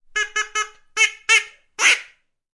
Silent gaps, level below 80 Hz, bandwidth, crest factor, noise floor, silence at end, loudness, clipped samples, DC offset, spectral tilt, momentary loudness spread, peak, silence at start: none; -60 dBFS; 11.5 kHz; 20 dB; -51 dBFS; 0.5 s; -18 LUFS; under 0.1%; under 0.1%; 4 dB/octave; 10 LU; -2 dBFS; 0.15 s